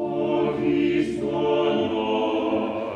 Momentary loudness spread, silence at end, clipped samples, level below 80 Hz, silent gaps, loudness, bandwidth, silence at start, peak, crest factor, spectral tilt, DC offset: 3 LU; 0 s; under 0.1%; -54 dBFS; none; -23 LUFS; 9.2 kHz; 0 s; -10 dBFS; 14 dB; -7 dB/octave; under 0.1%